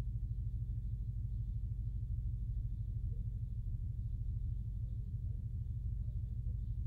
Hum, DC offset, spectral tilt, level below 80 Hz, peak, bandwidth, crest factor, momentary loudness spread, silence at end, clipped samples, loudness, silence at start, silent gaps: none; under 0.1%; -11 dB/octave; -42 dBFS; -30 dBFS; 0.7 kHz; 10 dB; 1 LU; 0 s; under 0.1%; -42 LUFS; 0 s; none